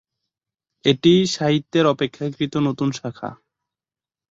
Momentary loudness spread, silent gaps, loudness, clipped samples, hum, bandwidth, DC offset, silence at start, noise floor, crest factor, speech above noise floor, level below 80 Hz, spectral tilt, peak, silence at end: 14 LU; none; -20 LUFS; under 0.1%; none; 8 kHz; under 0.1%; 0.85 s; under -90 dBFS; 20 dB; over 71 dB; -60 dBFS; -5.5 dB/octave; -2 dBFS; 0.95 s